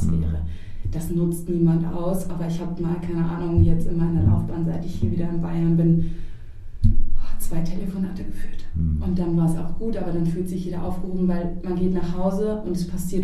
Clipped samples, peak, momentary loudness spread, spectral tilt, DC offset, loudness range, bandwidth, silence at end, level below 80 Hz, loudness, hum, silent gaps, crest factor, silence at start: under 0.1%; -4 dBFS; 11 LU; -8.5 dB/octave; under 0.1%; 4 LU; 13.5 kHz; 0 s; -30 dBFS; -24 LUFS; none; none; 16 dB; 0 s